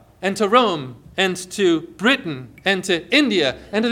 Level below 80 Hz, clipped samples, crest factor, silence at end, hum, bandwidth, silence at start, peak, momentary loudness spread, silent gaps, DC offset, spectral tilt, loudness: -56 dBFS; under 0.1%; 18 dB; 0 s; none; 16 kHz; 0.2 s; -2 dBFS; 9 LU; none; under 0.1%; -4 dB/octave; -19 LUFS